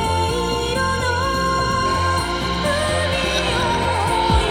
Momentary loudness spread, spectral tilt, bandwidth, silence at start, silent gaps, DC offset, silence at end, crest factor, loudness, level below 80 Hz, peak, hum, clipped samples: 2 LU; -4.5 dB/octave; over 20 kHz; 0 s; none; under 0.1%; 0 s; 14 dB; -19 LUFS; -30 dBFS; -4 dBFS; none; under 0.1%